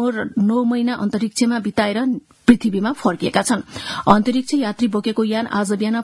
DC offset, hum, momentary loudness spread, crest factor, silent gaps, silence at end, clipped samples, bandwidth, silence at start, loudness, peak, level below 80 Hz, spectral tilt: under 0.1%; none; 6 LU; 18 dB; none; 0 s; under 0.1%; 12 kHz; 0 s; -19 LUFS; 0 dBFS; -50 dBFS; -5 dB/octave